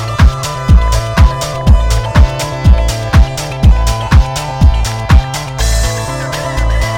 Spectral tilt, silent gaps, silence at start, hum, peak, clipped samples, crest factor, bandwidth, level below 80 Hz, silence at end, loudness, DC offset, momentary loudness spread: -5.5 dB/octave; none; 0 s; none; 0 dBFS; 1%; 10 dB; 16 kHz; -12 dBFS; 0 s; -12 LUFS; under 0.1%; 6 LU